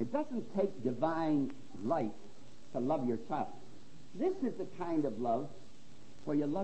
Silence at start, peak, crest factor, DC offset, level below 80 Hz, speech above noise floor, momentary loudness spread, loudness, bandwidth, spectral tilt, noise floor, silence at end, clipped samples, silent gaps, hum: 0 s; -20 dBFS; 16 dB; 0.8%; -68 dBFS; 23 dB; 10 LU; -36 LUFS; 8.4 kHz; -8 dB/octave; -59 dBFS; 0 s; under 0.1%; none; none